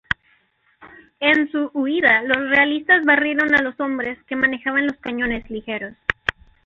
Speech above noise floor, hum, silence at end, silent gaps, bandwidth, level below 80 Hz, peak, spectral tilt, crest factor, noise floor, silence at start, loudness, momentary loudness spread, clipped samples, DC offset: 42 dB; none; 0.35 s; none; 7.2 kHz; -50 dBFS; -2 dBFS; -5.5 dB/octave; 18 dB; -61 dBFS; 0.1 s; -19 LUFS; 11 LU; under 0.1%; under 0.1%